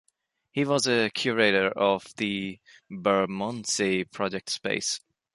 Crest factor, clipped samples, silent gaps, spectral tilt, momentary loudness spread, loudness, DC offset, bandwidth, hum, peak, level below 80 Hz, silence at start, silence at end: 20 dB; under 0.1%; none; -3.5 dB/octave; 9 LU; -26 LUFS; under 0.1%; 11.5 kHz; none; -8 dBFS; -66 dBFS; 0.55 s; 0.35 s